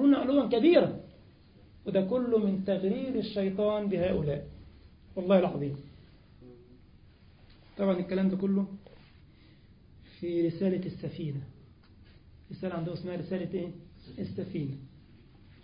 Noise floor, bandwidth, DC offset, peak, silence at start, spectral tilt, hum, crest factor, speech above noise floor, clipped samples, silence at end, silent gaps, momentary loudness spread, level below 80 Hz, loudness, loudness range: -57 dBFS; 5.2 kHz; under 0.1%; -10 dBFS; 0 s; -11 dB/octave; none; 20 dB; 27 dB; under 0.1%; 0.75 s; none; 17 LU; -58 dBFS; -30 LUFS; 9 LU